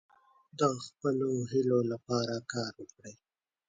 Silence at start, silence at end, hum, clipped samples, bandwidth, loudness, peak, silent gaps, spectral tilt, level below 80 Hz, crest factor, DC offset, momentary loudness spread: 0.55 s; 0.55 s; none; under 0.1%; 9.4 kHz; -32 LUFS; -14 dBFS; none; -6 dB/octave; -74 dBFS; 20 dB; under 0.1%; 20 LU